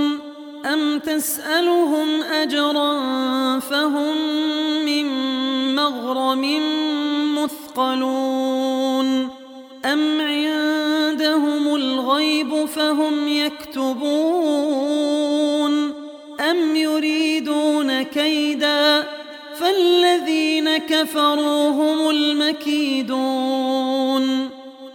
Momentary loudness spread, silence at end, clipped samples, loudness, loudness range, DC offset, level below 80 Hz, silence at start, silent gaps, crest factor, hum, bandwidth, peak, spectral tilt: 6 LU; 0 s; under 0.1%; -19 LUFS; 3 LU; under 0.1%; -70 dBFS; 0 s; none; 16 dB; none; 19 kHz; -4 dBFS; -2 dB/octave